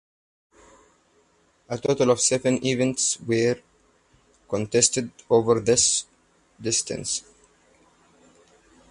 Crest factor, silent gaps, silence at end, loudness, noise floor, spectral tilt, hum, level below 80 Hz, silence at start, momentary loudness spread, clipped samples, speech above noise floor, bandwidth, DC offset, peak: 20 dB; none; 1.7 s; -23 LUFS; -63 dBFS; -3 dB/octave; none; -58 dBFS; 1.7 s; 11 LU; under 0.1%; 40 dB; 11.5 kHz; under 0.1%; -6 dBFS